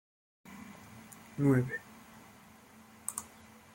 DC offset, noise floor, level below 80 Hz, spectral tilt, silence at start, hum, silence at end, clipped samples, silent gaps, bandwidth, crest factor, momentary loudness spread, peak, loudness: under 0.1%; -57 dBFS; -72 dBFS; -6.5 dB/octave; 0.45 s; none; 0.45 s; under 0.1%; none; 16.5 kHz; 24 dB; 27 LU; -14 dBFS; -34 LUFS